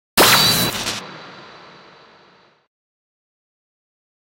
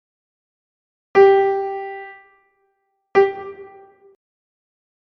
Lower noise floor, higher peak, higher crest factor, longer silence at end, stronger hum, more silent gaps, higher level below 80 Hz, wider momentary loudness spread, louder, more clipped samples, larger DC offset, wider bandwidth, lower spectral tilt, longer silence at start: second, -53 dBFS vs -70 dBFS; about the same, 0 dBFS vs -2 dBFS; about the same, 22 dB vs 20 dB; first, 2.85 s vs 1.4 s; neither; neither; first, -50 dBFS vs -64 dBFS; first, 26 LU vs 23 LU; first, -14 LUFS vs -17 LUFS; neither; neither; first, 16.5 kHz vs 6.2 kHz; second, -1.5 dB/octave vs -6 dB/octave; second, 0.15 s vs 1.15 s